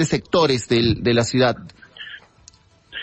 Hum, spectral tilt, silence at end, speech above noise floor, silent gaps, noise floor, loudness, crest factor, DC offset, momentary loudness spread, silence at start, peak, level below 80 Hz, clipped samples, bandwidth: none; -5 dB/octave; 0 s; 33 dB; none; -51 dBFS; -18 LUFS; 16 dB; under 0.1%; 19 LU; 0 s; -6 dBFS; -44 dBFS; under 0.1%; 8.8 kHz